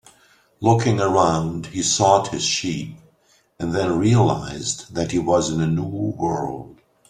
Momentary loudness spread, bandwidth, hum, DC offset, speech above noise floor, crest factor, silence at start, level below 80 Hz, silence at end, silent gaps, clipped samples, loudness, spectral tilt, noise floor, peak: 10 LU; 11 kHz; none; under 0.1%; 40 dB; 18 dB; 0.6 s; -50 dBFS; 0.35 s; none; under 0.1%; -20 LUFS; -5 dB/octave; -60 dBFS; -2 dBFS